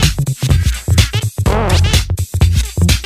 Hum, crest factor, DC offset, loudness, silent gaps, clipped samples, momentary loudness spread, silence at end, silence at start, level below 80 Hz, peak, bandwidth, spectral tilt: none; 12 dB; under 0.1%; -14 LUFS; none; under 0.1%; 4 LU; 0 s; 0 s; -18 dBFS; 0 dBFS; 16 kHz; -4.5 dB/octave